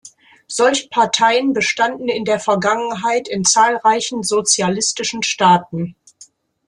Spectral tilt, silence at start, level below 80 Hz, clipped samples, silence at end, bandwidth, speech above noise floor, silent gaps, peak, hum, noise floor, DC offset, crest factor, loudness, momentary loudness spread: -2.5 dB/octave; 0.05 s; -60 dBFS; under 0.1%; 0.45 s; 12 kHz; 31 dB; none; -2 dBFS; none; -48 dBFS; under 0.1%; 16 dB; -16 LUFS; 6 LU